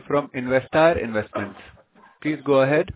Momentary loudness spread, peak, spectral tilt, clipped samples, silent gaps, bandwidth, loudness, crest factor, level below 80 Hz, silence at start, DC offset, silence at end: 12 LU; -4 dBFS; -10.5 dB/octave; under 0.1%; none; 4 kHz; -22 LUFS; 18 dB; -48 dBFS; 0.1 s; under 0.1%; 0.05 s